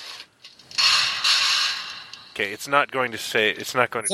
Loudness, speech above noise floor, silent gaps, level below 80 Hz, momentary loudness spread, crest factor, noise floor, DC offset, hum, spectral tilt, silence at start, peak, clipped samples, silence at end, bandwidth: -21 LUFS; 25 dB; none; -68 dBFS; 17 LU; 22 dB; -48 dBFS; under 0.1%; none; -0.5 dB/octave; 0 s; -2 dBFS; under 0.1%; 0 s; 16 kHz